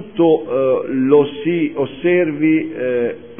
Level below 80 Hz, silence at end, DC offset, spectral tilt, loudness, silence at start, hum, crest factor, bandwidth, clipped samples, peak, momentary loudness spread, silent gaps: -58 dBFS; 0.05 s; 0.5%; -11.5 dB/octave; -16 LUFS; 0 s; none; 16 dB; 3.6 kHz; under 0.1%; 0 dBFS; 6 LU; none